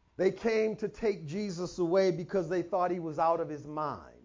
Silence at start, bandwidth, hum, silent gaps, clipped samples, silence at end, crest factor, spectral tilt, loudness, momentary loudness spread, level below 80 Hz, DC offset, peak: 0.2 s; 7.6 kHz; none; none; under 0.1%; 0.15 s; 14 dB; -6.5 dB/octave; -32 LUFS; 8 LU; -62 dBFS; under 0.1%; -16 dBFS